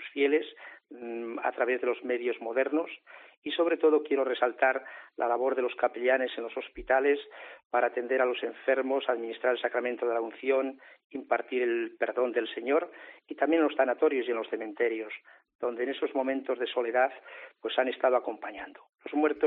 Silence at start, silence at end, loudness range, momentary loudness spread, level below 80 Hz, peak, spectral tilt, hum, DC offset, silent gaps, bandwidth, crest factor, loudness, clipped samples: 0 s; 0 s; 2 LU; 16 LU; -68 dBFS; -10 dBFS; 0 dB/octave; none; under 0.1%; 3.37-3.42 s, 7.65-7.70 s, 11.04-11.10 s, 15.55-15.59 s, 18.89-18.93 s; 4.1 kHz; 20 dB; -29 LUFS; under 0.1%